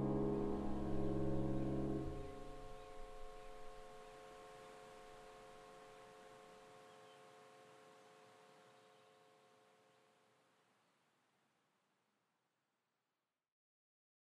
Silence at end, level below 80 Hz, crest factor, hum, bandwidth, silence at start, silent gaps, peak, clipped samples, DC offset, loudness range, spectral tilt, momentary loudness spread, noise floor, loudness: 5.45 s; -58 dBFS; 18 dB; none; 11.5 kHz; 0 s; none; -28 dBFS; under 0.1%; under 0.1%; 22 LU; -8 dB/octave; 23 LU; under -90 dBFS; -46 LUFS